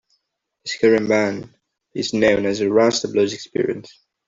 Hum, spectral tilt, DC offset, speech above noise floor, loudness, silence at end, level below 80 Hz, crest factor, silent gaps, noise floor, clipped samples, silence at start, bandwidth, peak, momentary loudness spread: none; -4.5 dB/octave; under 0.1%; 56 dB; -19 LUFS; 0.4 s; -58 dBFS; 18 dB; none; -75 dBFS; under 0.1%; 0.65 s; 7.8 kHz; -2 dBFS; 15 LU